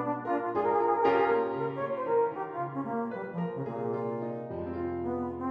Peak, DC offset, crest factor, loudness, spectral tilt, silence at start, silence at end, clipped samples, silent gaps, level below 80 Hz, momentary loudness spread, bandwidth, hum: -12 dBFS; under 0.1%; 18 dB; -31 LUFS; -9 dB/octave; 0 s; 0 s; under 0.1%; none; -64 dBFS; 10 LU; 5.6 kHz; none